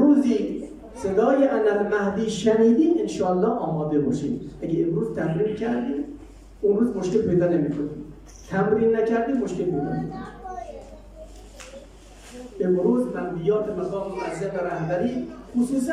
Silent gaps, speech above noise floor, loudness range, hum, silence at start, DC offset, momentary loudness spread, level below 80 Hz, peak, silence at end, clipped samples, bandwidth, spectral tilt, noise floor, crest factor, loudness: none; 23 dB; 7 LU; none; 0 s; under 0.1%; 19 LU; -50 dBFS; -8 dBFS; 0 s; under 0.1%; 11.5 kHz; -7 dB/octave; -45 dBFS; 16 dB; -23 LUFS